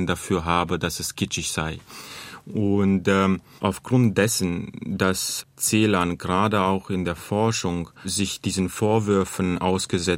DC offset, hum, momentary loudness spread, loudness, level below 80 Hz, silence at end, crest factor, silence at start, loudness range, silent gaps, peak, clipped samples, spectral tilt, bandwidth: under 0.1%; none; 9 LU; -23 LUFS; -52 dBFS; 0 s; 20 dB; 0 s; 2 LU; none; -4 dBFS; under 0.1%; -4.5 dB/octave; 16 kHz